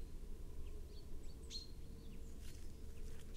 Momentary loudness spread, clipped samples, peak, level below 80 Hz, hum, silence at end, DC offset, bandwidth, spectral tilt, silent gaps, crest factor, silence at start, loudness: 6 LU; under 0.1%; -34 dBFS; -50 dBFS; none; 0 s; under 0.1%; 16 kHz; -4.5 dB/octave; none; 12 dB; 0 s; -55 LUFS